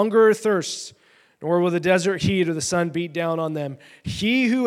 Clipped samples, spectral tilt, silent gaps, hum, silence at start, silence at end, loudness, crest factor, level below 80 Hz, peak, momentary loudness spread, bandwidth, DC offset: under 0.1%; -5 dB/octave; none; none; 0 s; 0 s; -22 LUFS; 16 dB; -56 dBFS; -4 dBFS; 15 LU; 14.5 kHz; under 0.1%